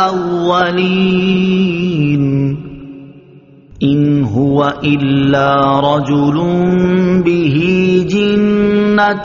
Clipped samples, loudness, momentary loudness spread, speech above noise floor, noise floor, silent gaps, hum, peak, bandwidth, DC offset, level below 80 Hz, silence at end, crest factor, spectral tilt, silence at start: under 0.1%; -12 LUFS; 4 LU; 29 dB; -41 dBFS; none; none; 0 dBFS; 7.2 kHz; under 0.1%; -42 dBFS; 0 s; 12 dB; -6 dB/octave; 0 s